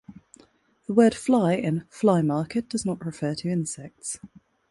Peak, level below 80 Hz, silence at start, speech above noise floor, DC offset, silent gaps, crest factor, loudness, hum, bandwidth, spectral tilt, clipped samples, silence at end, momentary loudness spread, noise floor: -6 dBFS; -62 dBFS; 0.1 s; 35 dB; under 0.1%; none; 20 dB; -25 LUFS; none; 11.5 kHz; -6 dB/octave; under 0.1%; 0.45 s; 14 LU; -59 dBFS